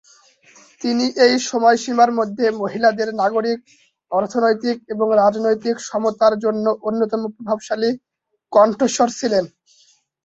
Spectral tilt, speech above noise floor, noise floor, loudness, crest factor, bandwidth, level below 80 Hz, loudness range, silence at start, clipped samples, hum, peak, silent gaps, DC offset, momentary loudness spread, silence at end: -4 dB/octave; 39 dB; -57 dBFS; -18 LUFS; 18 dB; 8.2 kHz; -64 dBFS; 2 LU; 0.8 s; under 0.1%; none; -2 dBFS; none; under 0.1%; 8 LU; 0.8 s